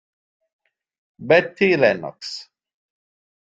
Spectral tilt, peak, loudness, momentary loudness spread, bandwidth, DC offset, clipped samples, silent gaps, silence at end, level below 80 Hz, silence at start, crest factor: -5.5 dB/octave; -2 dBFS; -18 LUFS; 17 LU; 7.8 kHz; under 0.1%; under 0.1%; none; 1.15 s; -64 dBFS; 1.2 s; 22 dB